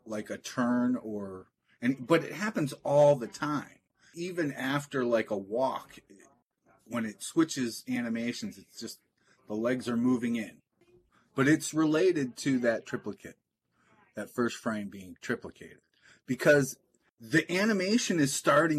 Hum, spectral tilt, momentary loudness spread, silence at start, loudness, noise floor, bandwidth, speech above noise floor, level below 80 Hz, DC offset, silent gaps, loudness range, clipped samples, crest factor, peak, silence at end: none; -5 dB/octave; 18 LU; 0.05 s; -30 LUFS; -72 dBFS; 14 kHz; 43 dB; -74 dBFS; under 0.1%; none; 6 LU; under 0.1%; 20 dB; -10 dBFS; 0 s